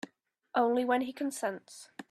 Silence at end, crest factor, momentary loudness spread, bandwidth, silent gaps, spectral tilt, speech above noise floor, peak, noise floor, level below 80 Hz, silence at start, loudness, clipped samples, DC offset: 0.1 s; 20 dB; 20 LU; 14 kHz; none; -3.5 dB/octave; 29 dB; -14 dBFS; -60 dBFS; -80 dBFS; 0.55 s; -31 LUFS; under 0.1%; under 0.1%